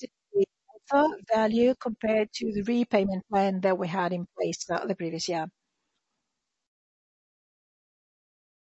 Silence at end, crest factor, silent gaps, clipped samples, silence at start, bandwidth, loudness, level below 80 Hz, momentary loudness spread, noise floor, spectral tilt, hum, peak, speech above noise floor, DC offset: 3.3 s; 20 dB; none; under 0.1%; 0 s; 8.2 kHz; -27 LUFS; -64 dBFS; 7 LU; -84 dBFS; -5.5 dB/octave; none; -10 dBFS; 57 dB; under 0.1%